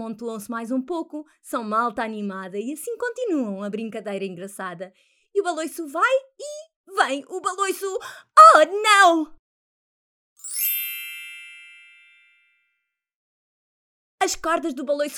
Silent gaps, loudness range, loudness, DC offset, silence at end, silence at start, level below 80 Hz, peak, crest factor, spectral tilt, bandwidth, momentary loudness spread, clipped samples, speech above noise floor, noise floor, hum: 6.76-6.84 s, 9.39-10.36 s, 13.15-14.18 s; 13 LU; -21 LUFS; under 0.1%; 0 s; 0 s; -64 dBFS; 0 dBFS; 24 dB; -2.5 dB/octave; over 20 kHz; 21 LU; under 0.1%; 56 dB; -77 dBFS; none